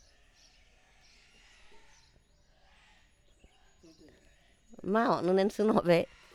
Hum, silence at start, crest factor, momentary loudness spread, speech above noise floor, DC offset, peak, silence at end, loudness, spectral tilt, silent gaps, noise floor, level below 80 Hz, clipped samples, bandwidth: none; 1.75 s; 22 dB; 5 LU; 37 dB; under 0.1%; -12 dBFS; 0.3 s; -29 LUFS; -6.5 dB/octave; none; -65 dBFS; -66 dBFS; under 0.1%; 14 kHz